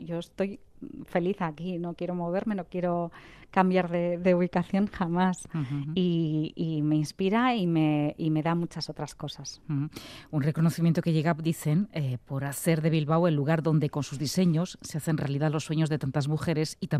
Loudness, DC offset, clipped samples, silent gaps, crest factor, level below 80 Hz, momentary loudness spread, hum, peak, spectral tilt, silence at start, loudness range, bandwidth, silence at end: -28 LUFS; under 0.1%; under 0.1%; none; 18 dB; -60 dBFS; 9 LU; none; -10 dBFS; -6.5 dB/octave; 0 s; 3 LU; 14.5 kHz; 0 s